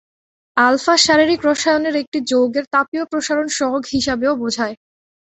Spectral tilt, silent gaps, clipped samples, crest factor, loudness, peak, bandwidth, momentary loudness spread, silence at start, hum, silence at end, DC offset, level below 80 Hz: -2.5 dB/octave; 2.07-2.12 s, 2.67-2.71 s, 2.88-2.92 s; under 0.1%; 16 dB; -17 LUFS; 0 dBFS; 8.2 kHz; 9 LU; 0.55 s; none; 0.45 s; under 0.1%; -52 dBFS